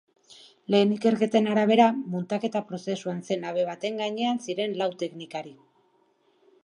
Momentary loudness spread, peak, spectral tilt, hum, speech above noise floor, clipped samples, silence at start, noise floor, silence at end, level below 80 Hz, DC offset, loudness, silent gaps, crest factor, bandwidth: 13 LU; -6 dBFS; -6 dB/octave; none; 41 dB; under 0.1%; 0.3 s; -66 dBFS; 1.1 s; -78 dBFS; under 0.1%; -26 LUFS; none; 22 dB; 10.5 kHz